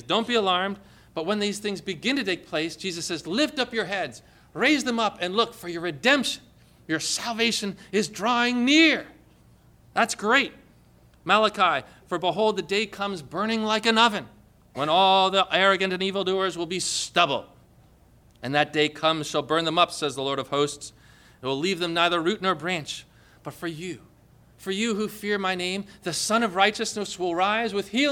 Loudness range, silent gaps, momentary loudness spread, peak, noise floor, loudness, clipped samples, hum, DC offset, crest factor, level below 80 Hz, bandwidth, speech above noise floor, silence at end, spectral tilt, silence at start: 5 LU; none; 13 LU; -6 dBFS; -56 dBFS; -24 LUFS; under 0.1%; none; under 0.1%; 20 dB; -62 dBFS; 18.5 kHz; 31 dB; 0 s; -3 dB/octave; 0.05 s